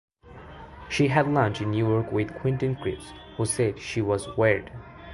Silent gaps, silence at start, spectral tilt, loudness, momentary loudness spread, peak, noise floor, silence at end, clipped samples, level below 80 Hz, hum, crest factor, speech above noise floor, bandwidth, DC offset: none; 0.25 s; -6 dB/octave; -26 LUFS; 20 LU; -6 dBFS; -46 dBFS; 0 s; under 0.1%; -50 dBFS; none; 20 dB; 21 dB; 11.5 kHz; under 0.1%